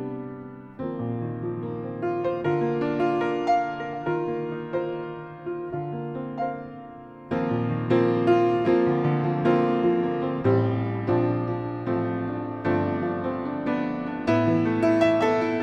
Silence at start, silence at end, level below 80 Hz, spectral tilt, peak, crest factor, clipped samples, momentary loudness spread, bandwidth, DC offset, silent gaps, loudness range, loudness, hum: 0 s; 0 s; -58 dBFS; -8.5 dB/octave; -8 dBFS; 16 dB; under 0.1%; 13 LU; 7 kHz; under 0.1%; none; 8 LU; -25 LUFS; none